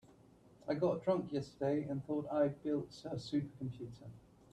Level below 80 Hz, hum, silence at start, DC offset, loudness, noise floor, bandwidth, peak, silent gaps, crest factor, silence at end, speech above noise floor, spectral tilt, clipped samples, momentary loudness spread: -70 dBFS; none; 0.65 s; under 0.1%; -38 LUFS; -64 dBFS; 10 kHz; -22 dBFS; none; 18 dB; 0.35 s; 26 dB; -8 dB/octave; under 0.1%; 15 LU